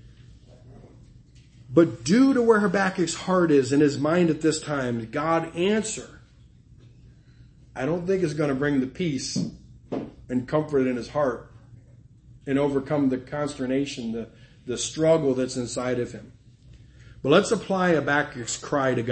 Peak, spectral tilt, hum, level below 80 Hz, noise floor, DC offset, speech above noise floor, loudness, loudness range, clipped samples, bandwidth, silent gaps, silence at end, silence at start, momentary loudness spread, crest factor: -6 dBFS; -5.5 dB/octave; none; -54 dBFS; -53 dBFS; under 0.1%; 29 dB; -24 LUFS; 7 LU; under 0.1%; 8.8 kHz; none; 0 s; 0.05 s; 13 LU; 20 dB